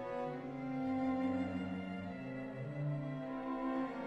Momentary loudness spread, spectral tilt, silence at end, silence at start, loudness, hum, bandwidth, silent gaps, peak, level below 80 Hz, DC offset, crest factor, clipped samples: 8 LU; -9 dB/octave; 0 s; 0 s; -40 LUFS; none; 7.4 kHz; none; -26 dBFS; -66 dBFS; under 0.1%; 12 dB; under 0.1%